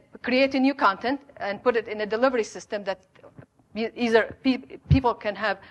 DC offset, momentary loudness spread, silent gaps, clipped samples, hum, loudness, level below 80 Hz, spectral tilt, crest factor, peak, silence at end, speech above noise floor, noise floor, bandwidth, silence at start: under 0.1%; 10 LU; none; under 0.1%; none; -25 LUFS; -44 dBFS; -6.5 dB/octave; 20 dB; -6 dBFS; 0.05 s; 26 dB; -51 dBFS; 9.2 kHz; 0.15 s